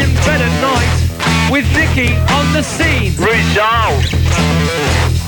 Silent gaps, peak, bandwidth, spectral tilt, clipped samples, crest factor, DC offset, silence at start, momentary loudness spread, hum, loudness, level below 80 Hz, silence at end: none; 0 dBFS; 17 kHz; -5 dB/octave; under 0.1%; 12 dB; under 0.1%; 0 s; 2 LU; none; -12 LUFS; -22 dBFS; 0 s